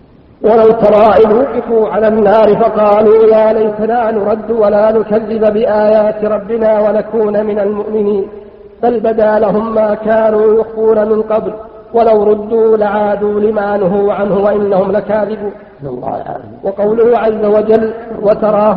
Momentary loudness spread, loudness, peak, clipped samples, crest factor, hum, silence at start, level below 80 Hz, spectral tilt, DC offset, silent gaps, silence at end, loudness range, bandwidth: 9 LU; -11 LUFS; 0 dBFS; under 0.1%; 10 dB; none; 0.4 s; -44 dBFS; -10 dB/octave; under 0.1%; none; 0 s; 5 LU; 5.2 kHz